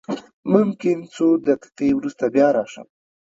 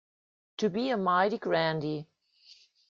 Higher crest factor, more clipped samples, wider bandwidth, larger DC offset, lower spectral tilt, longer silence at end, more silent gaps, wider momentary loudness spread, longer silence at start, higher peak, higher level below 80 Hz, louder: about the same, 20 dB vs 18 dB; neither; about the same, 7.8 kHz vs 7.4 kHz; neither; first, -7.5 dB/octave vs -6 dB/octave; second, 0.5 s vs 0.85 s; first, 0.33-0.43 s vs none; second, 8 LU vs 11 LU; second, 0.1 s vs 0.6 s; first, 0 dBFS vs -12 dBFS; first, -60 dBFS vs -72 dBFS; first, -20 LUFS vs -29 LUFS